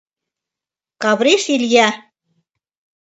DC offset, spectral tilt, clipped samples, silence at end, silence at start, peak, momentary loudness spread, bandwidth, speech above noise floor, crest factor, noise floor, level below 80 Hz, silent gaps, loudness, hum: under 0.1%; -2.5 dB/octave; under 0.1%; 1.05 s; 1 s; 0 dBFS; 8 LU; 8.2 kHz; 74 dB; 18 dB; -88 dBFS; -70 dBFS; none; -15 LUFS; none